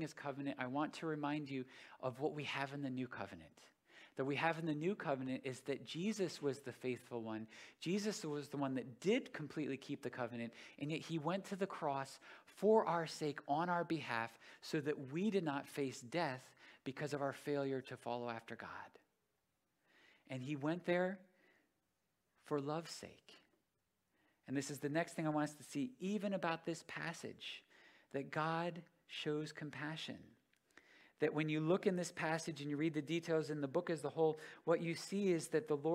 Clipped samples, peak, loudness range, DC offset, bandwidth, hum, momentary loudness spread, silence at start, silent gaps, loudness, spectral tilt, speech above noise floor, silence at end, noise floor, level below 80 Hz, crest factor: under 0.1%; -20 dBFS; 6 LU; under 0.1%; 16 kHz; none; 12 LU; 0 s; none; -42 LUFS; -5.5 dB/octave; 45 dB; 0 s; -86 dBFS; -86 dBFS; 22 dB